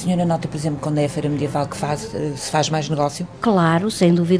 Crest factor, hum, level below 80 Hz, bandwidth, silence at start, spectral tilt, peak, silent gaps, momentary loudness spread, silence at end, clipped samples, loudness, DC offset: 16 dB; none; -48 dBFS; 11 kHz; 0 s; -6 dB/octave; -4 dBFS; none; 8 LU; 0 s; under 0.1%; -20 LUFS; 0.1%